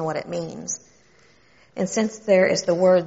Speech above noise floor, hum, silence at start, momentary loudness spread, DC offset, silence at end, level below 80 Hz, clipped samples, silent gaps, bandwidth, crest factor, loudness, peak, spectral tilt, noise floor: 35 dB; none; 0 s; 13 LU; under 0.1%; 0 s; -62 dBFS; under 0.1%; none; 8 kHz; 18 dB; -22 LUFS; -6 dBFS; -5 dB/octave; -56 dBFS